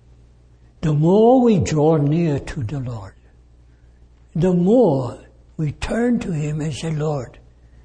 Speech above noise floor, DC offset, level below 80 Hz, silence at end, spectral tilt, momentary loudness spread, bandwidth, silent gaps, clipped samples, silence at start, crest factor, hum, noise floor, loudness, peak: 32 dB; under 0.1%; -42 dBFS; 0.55 s; -8 dB/octave; 15 LU; 9.8 kHz; none; under 0.1%; 0.8 s; 14 dB; none; -50 dBFS; -19 LUFS; -4 dBFS